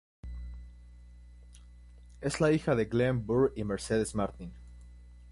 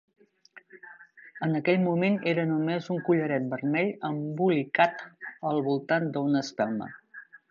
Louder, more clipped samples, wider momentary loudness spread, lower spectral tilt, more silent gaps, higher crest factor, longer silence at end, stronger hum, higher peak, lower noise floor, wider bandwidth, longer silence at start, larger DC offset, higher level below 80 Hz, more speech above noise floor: second, -30 LUFS vs -27 LUFS; neither; first, 21 LU vs 17 LU; about the same, -6.5 dB/octave vs -7 dB/octave; neither; about the same, 18 dB vs 20 dB; second, 0 s vs 0.15 s; first, 60 Hz at -50 dBFS vs none; second, -14 dBFS vs -8 dBFS; second, -52 dBFS vs -56 dBFS; first, 11.5 kHz vs 7.4 kHz; second, 0.25 s vs 0.55 s; neither; first, -48 dBFS vs -76 dBFS; second, 23 dB vs 29 dB